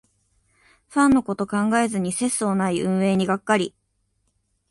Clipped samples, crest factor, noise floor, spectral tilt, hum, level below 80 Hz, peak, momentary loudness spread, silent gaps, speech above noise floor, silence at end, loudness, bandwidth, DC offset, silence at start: under 0.1%; 18 dB; -70 dBFS; -5 dB/octave; none; -56 dBFS; -4 dBFS; 5 LU; none; 49 dB; 1 s; -22 LUFS; 11.5 kHz; under 0.1%; 0.9 s